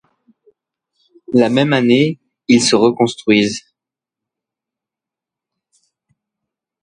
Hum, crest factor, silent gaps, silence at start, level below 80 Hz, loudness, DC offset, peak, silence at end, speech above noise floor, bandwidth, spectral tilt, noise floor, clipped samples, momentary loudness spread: none; 18 dB; none; 1.3 s; -58 dBFS; -14 LUFS; under 0.1%; 0 dBFS; 3.25 s; 73 dB; 11 kHz; -4.5 dB/octave; -86 dBFS; under 0.1%; 8 LU